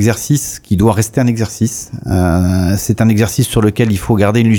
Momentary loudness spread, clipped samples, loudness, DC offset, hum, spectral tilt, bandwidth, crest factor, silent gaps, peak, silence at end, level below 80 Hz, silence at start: 6 LU; under 0.1%; -13 LUFS; under 0.1%; none; -6 dB/octave; 19 kHz; 12 dB; none; 0 dBFS; 0 s; -32 dBFS; 0 s